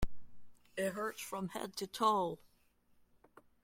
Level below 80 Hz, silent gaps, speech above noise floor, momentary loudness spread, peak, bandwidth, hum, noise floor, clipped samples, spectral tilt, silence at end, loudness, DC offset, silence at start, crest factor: -52 dBFS; none; 34 dB; 15 LU; -18 dBFS; 16.5 kHz; none; -71 dBFS; under 0.1%; -4.5 dB/octave; 1.3 s; -38 LUFS; under 0.1%; 0 s; 20 dB